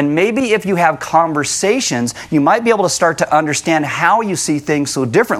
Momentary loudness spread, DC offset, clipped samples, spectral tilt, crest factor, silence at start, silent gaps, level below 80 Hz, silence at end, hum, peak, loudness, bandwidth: 4 LU; under 0.1%; under 0.1%; -4 dB/octave; 14 dB; 0 s; none; -54 dBFS; 0 s; none; 0 dBFS; -14 LUFS; 15.5 kHz